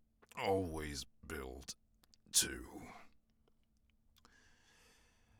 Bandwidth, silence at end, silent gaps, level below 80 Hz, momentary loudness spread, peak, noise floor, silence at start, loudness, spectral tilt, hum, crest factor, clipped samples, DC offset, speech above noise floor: over 20 kHz; 2.25 s; none; -62 dBFS; 21 LU; -16 dBFS; -74 dBFS; 0.35 s; -39 LUFS; -2.5 dB/octave; none; 28 dB; under 0.1%; under 0.1%; 34 dB